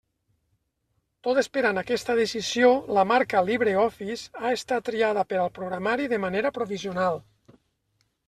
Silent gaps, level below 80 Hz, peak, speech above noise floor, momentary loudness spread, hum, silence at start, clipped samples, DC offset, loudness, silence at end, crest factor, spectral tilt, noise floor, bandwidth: none; -62 dBFS; -6 dBFS; 50 dB; 8 LU; none; 1.25 s; under 0.1%; under 0.1%; -25 LUFS; 1.05 s; 20 dB; -4.5 dB/octave; -75 dBFS; 13.5 kHz